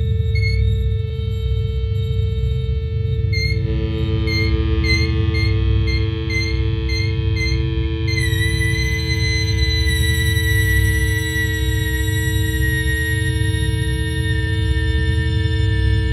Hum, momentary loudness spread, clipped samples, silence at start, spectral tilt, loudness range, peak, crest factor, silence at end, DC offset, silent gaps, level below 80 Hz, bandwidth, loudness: none; 4 LU; under 0.1%; 0 s; -5 dB/octave; 3 LU; -4 dBFS; 14 dB; 0 s; under 0.1%; none; -22 dBFS; 14 kHz; -19 LUFS